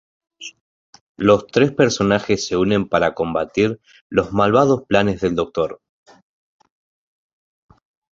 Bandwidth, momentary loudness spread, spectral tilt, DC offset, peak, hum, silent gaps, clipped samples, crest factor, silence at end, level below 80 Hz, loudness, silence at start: 7.8 kHz; 10 LU; -5.5 dB/octave; under 0.1%; -2 dBFS; none; 0.61-0.93 s, 1.01-1.15 s, 4.01-4.10 s; under 0.1%; 18 dB; 2.35 s; -48 dBFS; -18 LUFS; 0.4 s